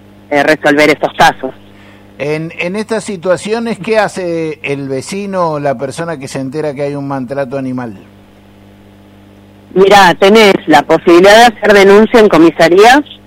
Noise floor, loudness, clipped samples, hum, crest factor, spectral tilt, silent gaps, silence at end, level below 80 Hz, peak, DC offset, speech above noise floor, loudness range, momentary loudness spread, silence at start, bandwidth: -39 dBFS; -9 LUFS; 0.6%; 50 Hz at -40 dBFS; 10 dB; -4.5 dB/octave; none; 0.15 s; -42 dBFS; 0 dBFS; under 0.1%; 30 dB; 14 LU; 14 LU; 0.3 s; 16.5 kHz